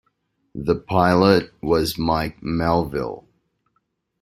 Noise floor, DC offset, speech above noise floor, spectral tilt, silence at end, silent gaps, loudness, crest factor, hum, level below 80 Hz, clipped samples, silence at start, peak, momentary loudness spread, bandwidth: -71 dBFS; under 0.1%; 51 dB; -6.5 dB/octave; 1 s; none; -20 LUFS; 20 dB; none; -44 dBFS; under 0.1%; 0.55 s; -2 dBFS; 13 LU; 16 kHz